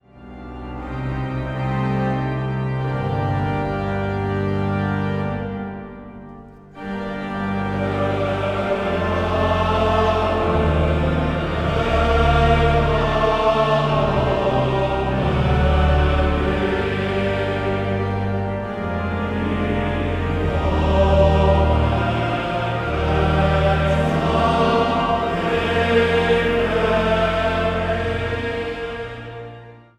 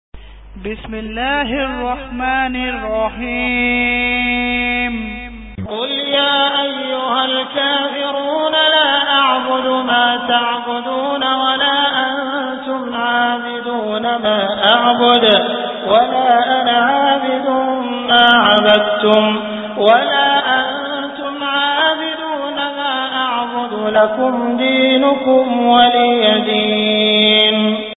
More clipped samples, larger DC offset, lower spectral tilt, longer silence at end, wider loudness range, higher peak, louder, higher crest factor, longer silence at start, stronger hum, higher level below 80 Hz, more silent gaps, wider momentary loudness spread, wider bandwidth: neither; neither; about the same, -7.5 dB/octave vs -6.5 dB/octave; first, 0.2 s vs 0.05 s; about the same, 6 LU vs 5 LU; about the same, -2 dBFS vs 0 dBFS; second, -20 LUFS vs -14 LUFS; about the same, 16 dB vs 14 dB; about the same, 0.15 s vs 0.15 s; neither; first, -28 dBFS vs -42 dBFS; neither; about the same, 10 LU vs 10 LU; first, 9.6 kHz vs 4 kHz